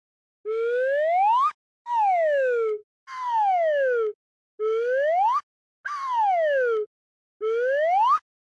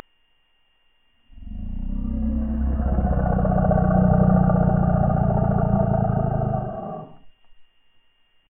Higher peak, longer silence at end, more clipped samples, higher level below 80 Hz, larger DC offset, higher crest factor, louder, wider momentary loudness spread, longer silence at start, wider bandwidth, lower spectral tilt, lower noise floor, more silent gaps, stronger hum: second, -14 dBFS vs -6 dBFS; second, 0.4 s vs 0.85 s; neither; second, -86 dBFS vs -28 dBFS; neither; second, 10 dB vs 16 dB; second, -24 LUFS vs -21 LUFS; second, 12 LU vs 15 LU; second, 0.45 s vs 1.35 s; first, 10.5 kHz vs 3 kHz; second, -1 dB/octave vs -14 dB/octave; first, under -90 dBFS vs -63 dBFS; first, 1.54-1.85 s, 2.83-3.07 s, 4.15-4.58 s, 5.43-5.84 s, 6.86-7.40 s vs none; neither